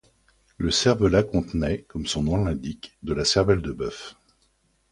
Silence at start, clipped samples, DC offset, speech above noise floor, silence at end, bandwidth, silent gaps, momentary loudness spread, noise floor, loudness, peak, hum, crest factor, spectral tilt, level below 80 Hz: 0.6 s; under 0.1%; under 0.1%; 43 dB; 0.8 s; 11.5 kHz; none; 14 LU; -66 dBFS; -24 LUFS; -6 dBFS; none; 18 dB; -5 dB/octave; -40 dBFS